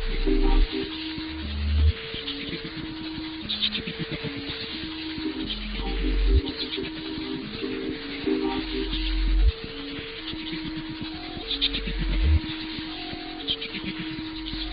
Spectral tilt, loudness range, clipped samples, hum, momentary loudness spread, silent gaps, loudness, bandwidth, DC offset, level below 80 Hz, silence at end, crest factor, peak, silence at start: -4 dB/octave; 2 LU; under 0.1%; none; 9 LU; none; -29 LUFS; 5.2 kHz; under 0.1%; -30 dBFS; 0 s; 18 dB; -10 dBFS; 0 s